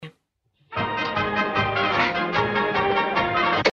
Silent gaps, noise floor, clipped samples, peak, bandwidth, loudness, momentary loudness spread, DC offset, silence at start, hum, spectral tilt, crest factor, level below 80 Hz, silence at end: none; -68 dBFS; under 0.1%; -6 dBFS; 7.8 kHz; -22 LUFS; 5 LU; under 0.1%; 0 s; none; -5.5 dB/octave; 18 dB; -50 dBFS; 0 s